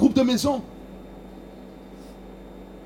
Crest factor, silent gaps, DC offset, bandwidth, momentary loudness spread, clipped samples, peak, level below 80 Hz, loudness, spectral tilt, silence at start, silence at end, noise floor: 20 dB; none; under 0.1%; 16.5 kHz; 22 LU; under 0.1%; -6 dBFS; -48 dBFS; -22 LUFS; -5 dB/octave; 0 s; 0 s; -42 dBFS